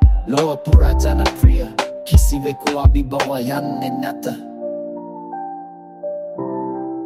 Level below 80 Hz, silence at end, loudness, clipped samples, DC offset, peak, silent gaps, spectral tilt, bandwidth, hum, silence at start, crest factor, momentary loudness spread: -18 dBFS; 0 s; -19 LUFS; under 0.1%; under 0.1%; 0 dBFS; none; -6.5 dB/octave; 15.5 kHz; none; 0 s; 16 dB; 15 LU